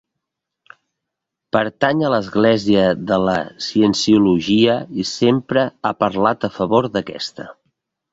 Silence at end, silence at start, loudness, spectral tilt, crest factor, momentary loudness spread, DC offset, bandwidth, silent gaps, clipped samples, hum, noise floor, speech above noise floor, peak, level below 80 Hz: 0.6 s; 1.55 s; -17 LUFS; -5.5 dB/octave; 16 dB; 9 LU; under 0.1%; 8 kHz; none; under 0.1%; none; -81 dBFS; 64 dB; -2 dBFS; -52 dBFS